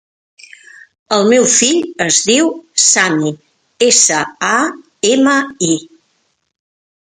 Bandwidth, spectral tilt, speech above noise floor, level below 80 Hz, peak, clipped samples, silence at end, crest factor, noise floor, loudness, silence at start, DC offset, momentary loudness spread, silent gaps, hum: 15 kHz; -2 dB/octave; 51 dB; -62 dBFS; 0 dBFS; under 0.1%; 1.35 s; 14 dB; -63 dBFS; -12 LUFS; 1.1 s; under 0.1%; 9 LU; none; none